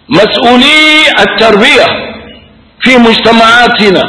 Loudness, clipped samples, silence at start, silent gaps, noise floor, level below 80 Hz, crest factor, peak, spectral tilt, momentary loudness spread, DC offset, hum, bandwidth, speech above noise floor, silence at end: -4 LUFS; 9%; 0.1 s; none; -35 dBFS; -36 dBFS; 6 dB; 0 dBFS; -4 dB/octave; 7 LU; 0.6%; none; 11 kHz; 31 dB; 0 s